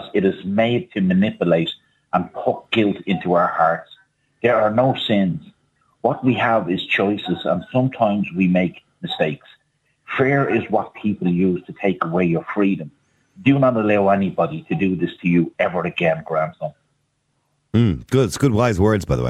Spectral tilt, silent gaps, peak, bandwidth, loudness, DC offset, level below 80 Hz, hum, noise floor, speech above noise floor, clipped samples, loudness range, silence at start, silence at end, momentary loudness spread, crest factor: -7 dB/octave; none; -4 dBFS; 13 kHz; -20 LUFS; under 0.1%; -48 dBFS; none; -69 dBFS; 50 dB; under 0.1%; 2 LU; 0 s; 0 s; 7 LU; 16 dB